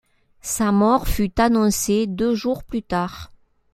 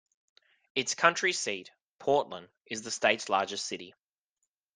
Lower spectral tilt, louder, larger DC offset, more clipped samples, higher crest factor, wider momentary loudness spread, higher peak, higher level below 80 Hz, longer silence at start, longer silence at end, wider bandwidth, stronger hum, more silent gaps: first, -5 dB/octave vs -1.5 dB/octave; first, -20 LUFS vs -30 LUFS; neither; neither; second, 18 dB vs 28 dB; second, 10 LU vs 16 LU; first, -2 dBFS vs -6 dBFS; first, -34 dBFS vs -80 dBFS; second, 0.45 s vs 0.75 s; second, 0.5 s vs 0.85 s; first, 16.5 kHz vs 10.5 kHz; neither; second, none vs 1.83-1.99 s, 2.61-2.65 s